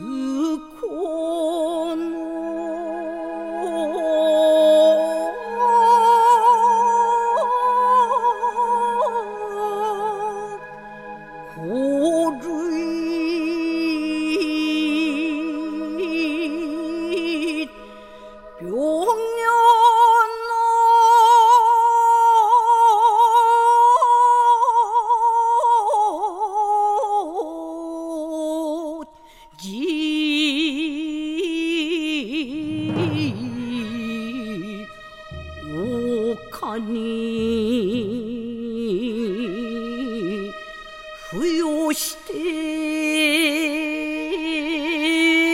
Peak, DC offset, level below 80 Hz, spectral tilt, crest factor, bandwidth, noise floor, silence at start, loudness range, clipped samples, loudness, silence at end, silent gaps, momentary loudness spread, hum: -4 dBFS; under 0.1%; -54 dBFS; -4 dB/octave; 16 dB; 16 kHz; -47 dBFS; 0 s; 11 LU; under 0.1%; -19 LUFS; 0 s; none; 15 LU; none